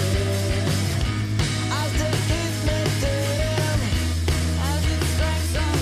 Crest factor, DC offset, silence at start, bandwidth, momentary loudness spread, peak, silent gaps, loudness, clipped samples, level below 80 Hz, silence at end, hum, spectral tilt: 10 dB; under 0.1%; 0 s; 15.5 kHz; 1 LU; -12 dBFS; none; -23 LUFS; under 0.1%; -30 dBFS; 0 s; none; -5 dB/octave